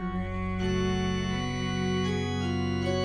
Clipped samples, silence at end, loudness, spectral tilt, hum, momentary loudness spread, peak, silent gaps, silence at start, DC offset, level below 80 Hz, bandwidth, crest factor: under 0.1%; 0 s; -29 LUFS; -6 dB/octave; none; 3 LU; -16 dBFS; none; 0 s; under 0.1%; -42 dBFS; 9.4 kHz; 12 dB